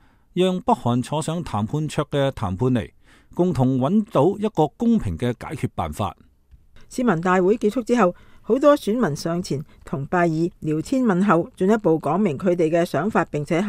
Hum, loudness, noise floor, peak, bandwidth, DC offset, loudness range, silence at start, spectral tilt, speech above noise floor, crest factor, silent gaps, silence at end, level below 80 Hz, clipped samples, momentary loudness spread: none; -21 LUFS; -52 dBFS; -2 dBFS; 15.5 kHz; under 0.1%; 3 LU; 0.35 s; -7 dB/octave; 32 dB; 18 dB; none; 0 s; -46 dBFS; under 0.1%; 9 LU